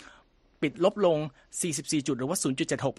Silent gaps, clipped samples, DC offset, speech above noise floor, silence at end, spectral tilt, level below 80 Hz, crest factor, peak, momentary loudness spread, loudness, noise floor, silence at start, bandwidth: none; under 0.1%; under 0.1%; 32 dB; 0.05 s; -4.5 dB/octave; -64 dBFS; 20 dB; -10 dBFS; 8 LU; -28 LUFS; -60 dBFS; 0 s; 13 kHz